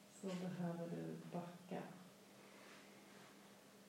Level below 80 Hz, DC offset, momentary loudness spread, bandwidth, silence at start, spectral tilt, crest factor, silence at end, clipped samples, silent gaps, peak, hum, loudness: under -90 dBFS; under 0.1%; 16 LU; 16 kHz; 0 s; -6.5 dB/octave; 16 dB; 0 s; under 0.1%; none; -34 dBFS; none; -50 LUFS